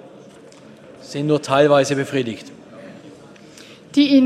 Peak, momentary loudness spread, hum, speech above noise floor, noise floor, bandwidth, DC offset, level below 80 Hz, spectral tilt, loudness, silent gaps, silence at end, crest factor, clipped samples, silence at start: -2 dBFS; 27 LU; none; 27 dB; -43 dBFS; 12 kHz; under 0.1%; -64 dBFS; -5.5 dB/octave; -18 LUFS; none; 0 s; 18 dB; under 0.1%; 1 s